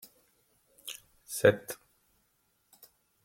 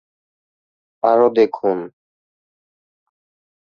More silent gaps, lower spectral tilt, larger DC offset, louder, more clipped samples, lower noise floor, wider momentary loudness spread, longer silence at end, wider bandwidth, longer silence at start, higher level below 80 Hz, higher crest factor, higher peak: neither; second, -4.5 dB/octave vs -7.5 dB/octave; neither; second, -29 LUFS vs -17 LUFS; neither; second, -74 dBFS vs under -90 dBFS; first, 21 LU vs 12 LU; second, 1.5 s vs 1.75 s; first, 16.5 kHz vs 6.4 kHz; second, 0.85 s vs 1.05 s; about the same, -70 dBFS vs -68 dBFS; first, 26 dB vs 20 dB; second, -8 dBFS vs -2 dBFS